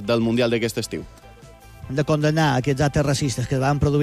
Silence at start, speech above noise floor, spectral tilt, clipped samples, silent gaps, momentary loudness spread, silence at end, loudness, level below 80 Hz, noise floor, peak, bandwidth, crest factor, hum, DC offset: 0 s; 24 dB; -6 dB/octave; under 0.1%; none; 9 LU; 0 s; -21 LUFS; -42 dBFS; -45 dBFS; -8 dBFS; 15 kHz; 12 dB; none; under 0.1%